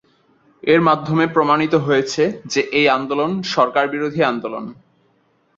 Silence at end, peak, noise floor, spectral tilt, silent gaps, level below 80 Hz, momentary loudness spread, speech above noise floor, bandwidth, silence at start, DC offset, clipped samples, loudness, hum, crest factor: 0.85 s; 0 dBFS; -61 dBFS; -5.5 dB/octave; none; -60 dBFS; 9 LU; 44 dB; 7.8 kHz; 0.65 s; under 0.1%; under 0.1%; -17 LUFS; none; 18 dB